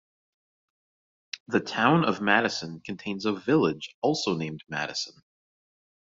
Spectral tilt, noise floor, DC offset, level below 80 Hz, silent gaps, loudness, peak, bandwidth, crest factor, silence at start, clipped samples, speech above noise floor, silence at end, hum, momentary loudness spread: -3.5 dB/octave; under -90 dBFS; under 0.1%; -68 dBFS; 1.40-1.46 s, 3.94-4.02 s; -26 LUFS; -4 dBFS; 7.8 kHz; 24 dB; 1.35 s; under 0.1%; over 63 dB; 0.95 s; none; 14 LU